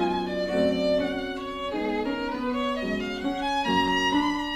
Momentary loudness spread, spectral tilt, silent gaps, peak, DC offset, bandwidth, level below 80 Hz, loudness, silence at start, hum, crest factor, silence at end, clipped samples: 7 LU; -5 dB/octave; none; -12 dBFS; under 0.1%; 14 kHz; -48 dBFS; -26 LUFS; 0 s; none; 14 dB; 0 s; under 0.1%